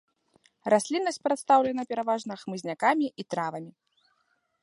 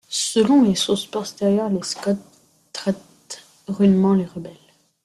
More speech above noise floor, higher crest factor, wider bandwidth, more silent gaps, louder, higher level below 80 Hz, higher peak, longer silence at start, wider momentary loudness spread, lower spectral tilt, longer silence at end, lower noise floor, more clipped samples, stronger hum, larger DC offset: first, 46 dB vs 22 dB; about the same, 20 dB vs 16 dB; second, 11.5 kHz vs 13 kHz; neither; second, -27 LUFS vs -20 LUFS; second, -76 dBFS vs -58 dBFS; about the same, -8 dBFS vs -6 dBFS; first, 0.65 s vs 0.1 s; second, 13 LU vs 20 LU; about the same, -4.5 dB/octave vs -5.5 dB/octave; first, 0.95 s vs 0.5 s; first, -73 dBFS vs -41 dBFS; neither; neither; neither